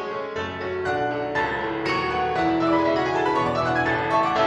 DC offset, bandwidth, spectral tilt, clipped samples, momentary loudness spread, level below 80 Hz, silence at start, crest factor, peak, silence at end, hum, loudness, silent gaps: under 0.1%; 9.4 kHz; -6 dB/octave; under 0.1%; 8 LU; -50 dBFS; 0 s; 14 dB; -8 dBFS; 0 s; none; -23 LUFS; none